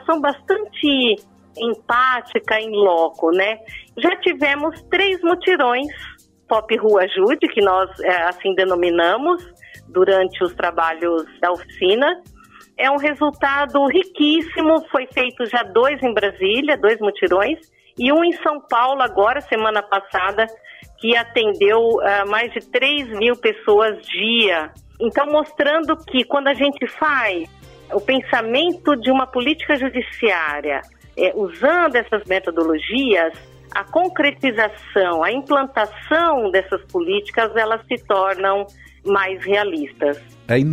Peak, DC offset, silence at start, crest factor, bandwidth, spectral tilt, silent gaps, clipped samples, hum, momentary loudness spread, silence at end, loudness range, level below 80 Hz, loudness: -2 dBFS; under 0.1%; 0.05 s; 18 dB; 13.5 kHz; -5.5 dB/octave; none; under 0.1%; none; 7 LU; 0 s; 2 LU; -52 dBFS; -18 LUFS